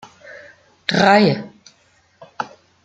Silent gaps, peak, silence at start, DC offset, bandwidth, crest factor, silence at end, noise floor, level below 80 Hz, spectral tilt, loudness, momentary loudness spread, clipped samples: none; 0 dBFS; 0.3 s; under 0.1%; 9 kHz; 20 dB; 0.4 s; -57 dBFS; -62 dBFS; -5.5 dB/octave; -16 LUFS; 27 LU; under 0.1%